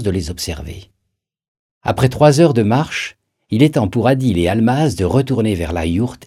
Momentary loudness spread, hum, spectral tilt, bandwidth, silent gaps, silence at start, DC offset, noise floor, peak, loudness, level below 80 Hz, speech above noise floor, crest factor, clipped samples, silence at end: 13 LU; none; -6.5 dB/octave; 15 kHz; 1.48-1.81 s; 0 s; under 0.1%; -74 dBFS; 0 dBFS; -16 LUFS; -40 dBFS; 59 dB; 16 dB; under 0.1%; 0.1 s